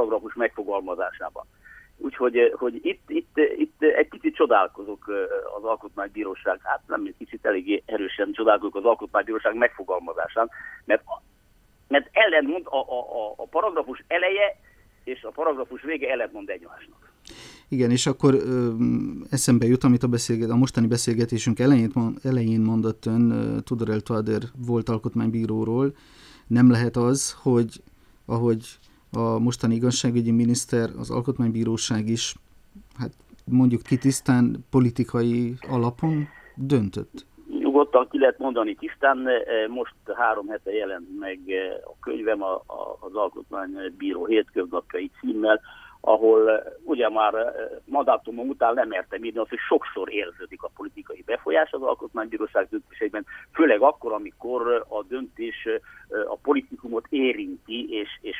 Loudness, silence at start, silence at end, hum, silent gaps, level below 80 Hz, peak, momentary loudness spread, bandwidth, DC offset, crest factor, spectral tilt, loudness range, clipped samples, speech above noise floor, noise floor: -24 LUFS; 0 s; 0 s; none; none; -56 dBFS; -4 dBFS; 13 LU; 14 kHz; under 0.1%; 20 dB; -5.5 dB/octave; 6 LU; under 0.1%; 35 dB; -59 dBFS